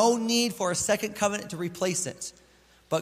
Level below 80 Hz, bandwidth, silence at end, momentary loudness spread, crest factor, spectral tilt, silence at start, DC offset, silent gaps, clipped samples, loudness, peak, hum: -62 dBFS; 16 kHz; 0 s; 10 LU; 18 dB; -3 dB/octave; 0 s; under 0.1%; none; under 0.1%; -27 LUFS; -10 dBFS; none